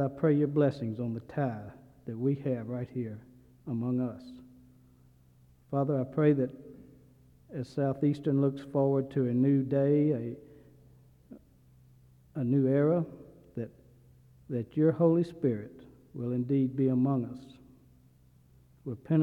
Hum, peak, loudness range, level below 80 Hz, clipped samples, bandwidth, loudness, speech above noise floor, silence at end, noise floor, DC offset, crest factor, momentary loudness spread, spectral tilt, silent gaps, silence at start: none; -12 dBFS; 7 LU; -66 dBFS; under 0.1%; 5.6 kHz; -30 LUFS; 32 dB; 0 s; -61 dBFS; under 0.1%; 18 dB; 19 LU; -10.5 dB/octave; none; 0 s